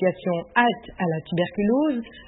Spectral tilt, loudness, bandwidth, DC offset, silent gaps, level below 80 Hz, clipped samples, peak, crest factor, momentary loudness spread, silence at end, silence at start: -11 dB/octave; -24 LUFS; 4.1 kHz; under 0.1%; none; -54 dBFS; under 0.1%; -4 dBFS; 20 dB; 6 LU; 0.05 s; 0 s